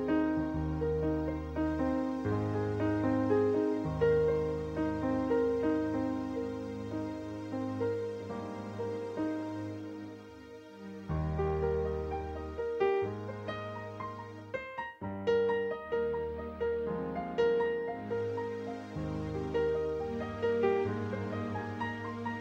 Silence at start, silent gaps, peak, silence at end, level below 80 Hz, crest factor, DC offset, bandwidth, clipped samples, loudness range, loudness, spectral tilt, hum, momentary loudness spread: 0 s; none; -16 dBFS; 0 s; -50 dBFS; 16 dB; under 0.1%; 8.2 kHz; under 0.1%; 7 LU; -34 LUFS; -8 dB/octave; none; 11 LU